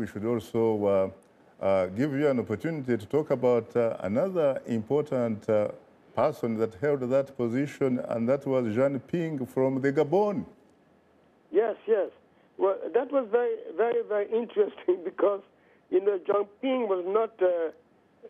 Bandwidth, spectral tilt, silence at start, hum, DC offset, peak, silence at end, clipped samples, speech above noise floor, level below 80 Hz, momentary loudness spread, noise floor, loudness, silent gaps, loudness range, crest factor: 13.5 kHz; -8 dB/octave; 0 s; none; under 0.1%; -14 dBFS; 0 s; under 0.1%; 35 dB; -72 dBFS; 5 LU; -62 dBFS; -28 LUFS; none; 2 LU; 14 dB